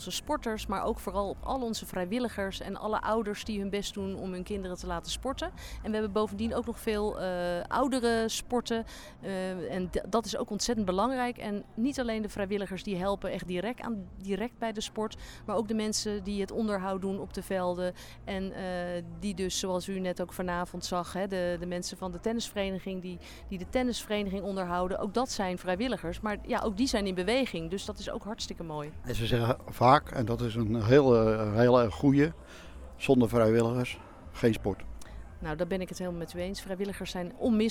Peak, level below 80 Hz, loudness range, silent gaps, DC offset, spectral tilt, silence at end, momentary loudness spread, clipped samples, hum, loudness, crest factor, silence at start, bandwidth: -6 dBFS; -48 dBFS; 8 LU; none; under 0.1%; -5.5 dB/octave; 0 s; 12 LU; under 0.1%; none; -31 LUFS; 24 dB; 0 s; 18.5 kHz